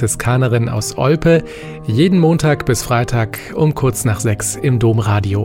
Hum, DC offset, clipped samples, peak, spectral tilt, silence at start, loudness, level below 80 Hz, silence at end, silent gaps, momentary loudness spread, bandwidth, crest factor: none; under 0.1%; under 0.1%; -2 dBFS; -6 dB/octave; 0 s; -15 LUFS; -36 dBFS; 0 s; none; 7 LU; 16.5 kHz; 12 dB